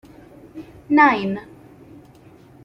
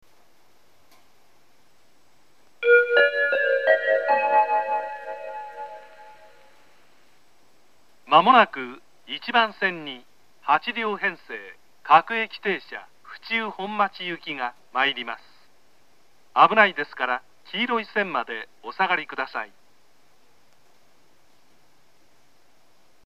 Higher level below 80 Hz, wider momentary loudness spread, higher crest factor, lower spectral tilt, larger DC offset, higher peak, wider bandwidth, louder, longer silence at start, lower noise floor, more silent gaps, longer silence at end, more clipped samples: first, -58 dBFS vs -80 dBFS; first, 26 LU vs 20 LU; second, 20 dB vs 26 dB; first, -7 dB/octave vs -5 dB/octave; second, under 0.1% vs 0.3%; about the same, -2 dBFS vs 0 dBFS; second, 6.2 kHz vs 12.5 kHz; first, -18 LUFS vs -22 LUFS; second, 0.55 s vs 2.6 s; second, -47 dBFS vs -63 dBFS; neither; second, 1.2 s vs 3.6 s; neither